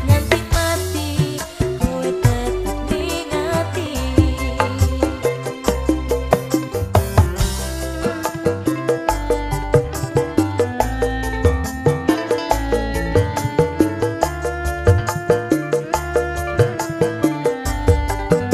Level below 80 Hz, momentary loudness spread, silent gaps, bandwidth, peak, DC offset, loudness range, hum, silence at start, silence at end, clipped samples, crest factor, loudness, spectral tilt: -28 dBFS; 5 LU; none; 15.5 kHz; 0 dBFS; under 0.1%; 1 LU; none; 0 s; 0 s; under 0.1%; 18 dB; -20 LUFS; -6 dB/octave